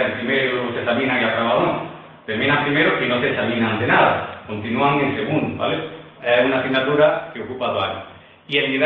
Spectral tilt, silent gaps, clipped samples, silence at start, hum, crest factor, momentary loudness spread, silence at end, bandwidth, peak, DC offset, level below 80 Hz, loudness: -8.5 dB/octave; none; under 0.1%; 0 s; none; 16 dB; 11 LU; 0 s; 5.2 kHz; -2 dBFS; under 0.1%; -56 dBFS; -19 LUFS